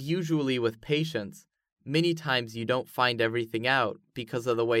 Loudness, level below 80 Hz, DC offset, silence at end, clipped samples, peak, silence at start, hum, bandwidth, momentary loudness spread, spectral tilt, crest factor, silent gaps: -28 LUFS; -68 dBFS; under 0.1%; 0 s; under 0.1%; -10 dBFS; 0 s; none; 16 kHz; 9 LU; -5.5 dB/octave; 18 dB; 1.72-1.76 s